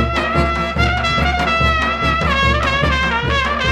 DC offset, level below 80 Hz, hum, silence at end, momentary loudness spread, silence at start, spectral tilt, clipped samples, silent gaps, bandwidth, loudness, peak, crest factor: under 0.1%; -24 dBFS; none; 0 s; 2 LU; 0 s; -5 dB/octave; under 0.1%; none; 12 kHz; -16 LUFS; -2 dBFS; 14 dB